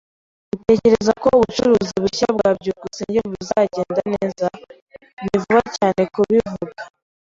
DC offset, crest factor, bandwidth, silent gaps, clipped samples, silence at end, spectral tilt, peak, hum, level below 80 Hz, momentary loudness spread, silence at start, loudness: under 0.1%; 16 dB; 7.8 kHz; 4.82-4.86 s, 5.13-5.17 s; under 0.1%; 0.5 s; -5.5 dB/octave; -2 dBFS; none; -48 dBFS; 13 LU; 0.55 s; -18 LUFS